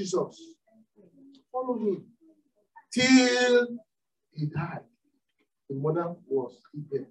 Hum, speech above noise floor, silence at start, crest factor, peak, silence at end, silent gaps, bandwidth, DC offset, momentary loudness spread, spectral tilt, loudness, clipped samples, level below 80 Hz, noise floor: none; 51 dB; 0 s; 22 dB; -8 dBFS; 0.05 s; none; 11 kHz; under 0.1%; 20 LU; -4.5 dB/octave; -27 LUFS; under 0.1%; -76 dBFS; -77 dBFS